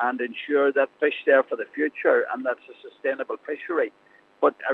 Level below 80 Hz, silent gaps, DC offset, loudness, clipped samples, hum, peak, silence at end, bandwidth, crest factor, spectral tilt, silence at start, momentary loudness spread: -88 dBFS; none; under 0.1%; -24 LUFS; under 0.1%; none; -6 dBFS; 0 s; 4.2 kHz; 18 dB; -6 dB/octave; 0 s; 10 LU